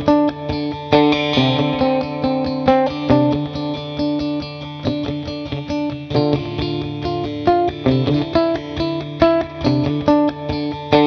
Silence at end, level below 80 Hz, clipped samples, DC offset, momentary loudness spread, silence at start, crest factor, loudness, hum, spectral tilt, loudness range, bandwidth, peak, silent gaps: 0 s; -40 dBFS; under 0.1%; under 0.1%; 8 LU; 0 s; 18 dB; -19 LUFS; none; -7.5 dB/octave; 5 LU; 6.6 kHz; 0 dBFS; none